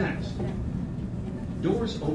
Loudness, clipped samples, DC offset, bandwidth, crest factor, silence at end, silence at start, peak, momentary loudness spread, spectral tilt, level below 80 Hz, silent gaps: -31 LUFS; under 0.1%; under 0.1%; 11 kHz; 16 dB; 0 s; 0 s; -14 dBFS; 7 LU; -7.5 dB/octave; -40 dBFS; none